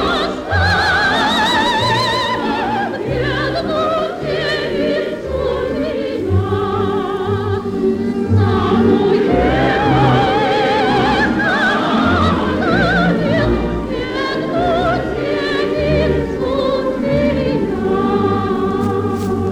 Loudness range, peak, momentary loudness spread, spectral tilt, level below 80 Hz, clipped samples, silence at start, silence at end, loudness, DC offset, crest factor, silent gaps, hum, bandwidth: 5 LU; -2 dBFS; 6 LU; -6.5 dB/octave; -32 dBFS; under 0.1%; 0 s; 0 s; -16 LUFS; under 0.1%; 14 dB; none; none; 14.5 kHz